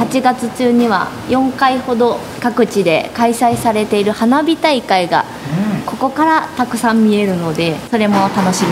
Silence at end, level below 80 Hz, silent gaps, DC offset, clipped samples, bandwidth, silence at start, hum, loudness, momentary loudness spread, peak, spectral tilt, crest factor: 0 s; -48 dBFS; none; under 0.1%; under 0.1%; 16 kHz; 0 s; none; -14 LUFS; 5 LU; 0 dBFS; -5 dB/octave; 14 dB